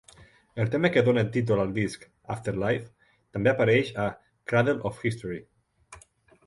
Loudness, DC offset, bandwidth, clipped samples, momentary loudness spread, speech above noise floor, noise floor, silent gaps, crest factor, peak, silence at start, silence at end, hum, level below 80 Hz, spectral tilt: -26 LUFS; under 0.1%; 11.5 kHz; under 0.1%; 15 LU; 31 dB; -57 dBFS; none; 20 dB; -6 dBFS; 0.2 s; 0.5 s; none; -56 dBFS; -7 dB/octave